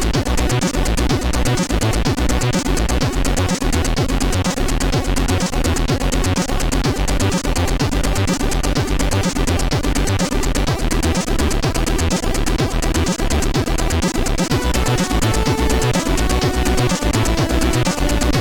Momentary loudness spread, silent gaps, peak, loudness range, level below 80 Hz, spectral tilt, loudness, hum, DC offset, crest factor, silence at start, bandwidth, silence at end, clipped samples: 2 LU; none; -4 dBFS; 1 LU; -20 dBFS; -4.5 dB/octave; -18 LUFS; none; under 0.1%; 12 dB; 0 s; 18 kHz; 0 s; under 0.1%